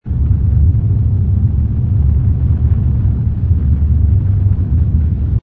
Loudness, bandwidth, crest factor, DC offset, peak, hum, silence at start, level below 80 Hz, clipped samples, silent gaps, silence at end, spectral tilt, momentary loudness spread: -14 LUFS; 1.8 kHz; 10 dB; under 0.1%; -2 dBFS; none; 0.05 s; -16 dBFS; under 0.1%; none; 0.05 s; -13 dB/octave; 3 LU